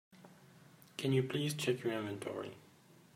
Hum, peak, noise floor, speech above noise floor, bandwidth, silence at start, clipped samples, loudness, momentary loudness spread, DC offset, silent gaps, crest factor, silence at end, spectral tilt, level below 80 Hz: none; -20 dBFS; -61 dBFS; 25 dB; 16 kHz; 0.15 s; under 0.1%; -37 LUFS; 16 LU; under 0.1%; none; 20 dB; 0.5 s; -5.5 dB/octave; -78 dBFS